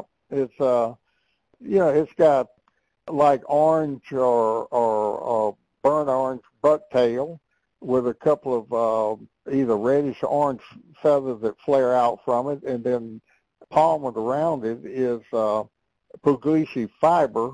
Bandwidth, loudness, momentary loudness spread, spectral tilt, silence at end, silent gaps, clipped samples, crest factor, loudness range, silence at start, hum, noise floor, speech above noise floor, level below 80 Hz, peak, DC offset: 9.8 kHz; -23 LUFS; 9 LU; -7.5 dB/octave; 0 s; none; under 0.1%; 16 dB; 3 LU; 0.3 s; none; -71 dBFS; 49 dB; -64 dBFS; -6 dBFS; under 0.1%